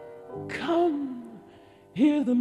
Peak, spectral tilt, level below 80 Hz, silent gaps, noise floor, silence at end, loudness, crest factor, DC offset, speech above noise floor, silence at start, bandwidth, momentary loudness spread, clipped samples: -12 dBFS; -6.5 dB/octave; -68 dBFS; none; -52 dBFS; 0 s; -26 LUFS; 16 dB; under 0.1%; 28 dB; 0 s; 10 kHz; 18 LU; under 0.1%